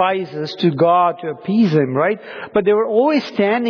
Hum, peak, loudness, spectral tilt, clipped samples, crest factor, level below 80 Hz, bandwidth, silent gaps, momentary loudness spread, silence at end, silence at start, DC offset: none; -4 dBFS; -17 LUFS; -8 dB/octave; under 0.1%; 12 dB; -60 dBFS; 5.4 kHz; none; 8 LU; 0 s; 0 s; under 0.1%